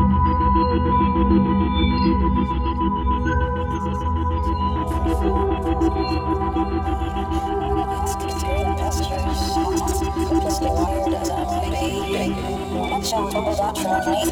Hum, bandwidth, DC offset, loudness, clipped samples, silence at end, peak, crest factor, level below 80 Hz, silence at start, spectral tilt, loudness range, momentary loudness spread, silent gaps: none; 17.5 kHz; under 0.1%; -21 LUFS; under 0.1%; 0 s; -6 dBFS; 14 dB; -26 dBFS; 0 s; -6 dB/octave; 3 LU; 6 LU; none